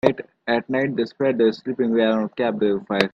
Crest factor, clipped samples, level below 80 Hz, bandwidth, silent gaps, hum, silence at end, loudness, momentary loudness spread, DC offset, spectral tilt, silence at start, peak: 20 dB; under 0.1%; -62 dBFS; 8.6 kHz; none; none; 0.05 s; -22 LUFS; 5 LU; under 0.1%; -7 dB/octave; 0.05 s; 0 dBFS